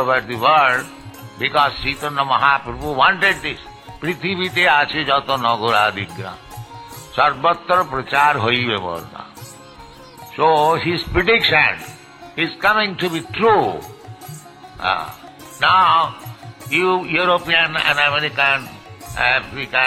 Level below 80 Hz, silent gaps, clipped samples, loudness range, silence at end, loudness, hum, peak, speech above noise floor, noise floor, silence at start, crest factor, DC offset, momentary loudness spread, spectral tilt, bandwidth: -44 dBFS; none; under 0.1%; 3 LU; 0 s; -17 LUFS; none; -2 dBFS; 23 dB; -40 dBFS; 0 s; 18 dB; under 0.1%; 22 LU; -4 dB/octave; 16.5 kHz